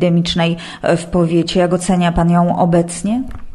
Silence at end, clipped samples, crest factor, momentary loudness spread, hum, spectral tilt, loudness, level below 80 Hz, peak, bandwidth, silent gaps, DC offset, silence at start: 0 s; under 0.1%; 14 dB; 6 LU; none; -6 dB/octave; -15 LUFS; -34 dBFS; 0 dBFS; 11.5 kHz; none; under 0.1%; 0 s